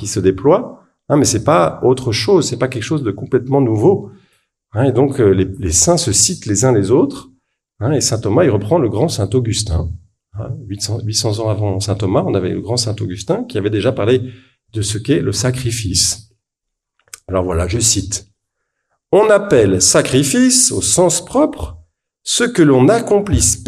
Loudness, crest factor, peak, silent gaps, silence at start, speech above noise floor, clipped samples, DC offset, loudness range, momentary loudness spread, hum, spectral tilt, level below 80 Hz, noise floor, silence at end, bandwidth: -14 LUFS; 16 dB; 0 dBFS; none; 0 s; 65 dB; under 0.1%; under 0.1%; 6 LU; 11 LU; none; -4.5 dB/octave; -36 dBFS; -79 dBFS; 0 s; 15 kHz